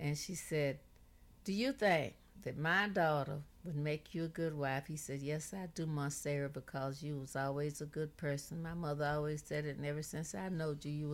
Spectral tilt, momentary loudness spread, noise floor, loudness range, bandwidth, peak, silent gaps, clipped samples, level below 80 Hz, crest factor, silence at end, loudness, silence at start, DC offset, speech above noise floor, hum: -5.5 dB/octave; 10 LU; -62 dBFS; 4 LU; 16.5 kHz; -20 dBFS; none; under 0.1%; -64 dBFS; 18 dB; 0 s; -39 LUFS; 0 s; under 0.1%; 23 dB; none